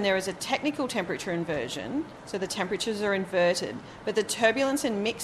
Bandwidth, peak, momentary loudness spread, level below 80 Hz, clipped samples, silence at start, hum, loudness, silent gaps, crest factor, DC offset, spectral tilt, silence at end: 13.5 kHz; -10 dBFS; 9 LU; -60 dBFS; under 0.1%; 0 s; none; -28 LUFS; none; 18 dB; under 0.1%; -3.5 dB/octave; 0 s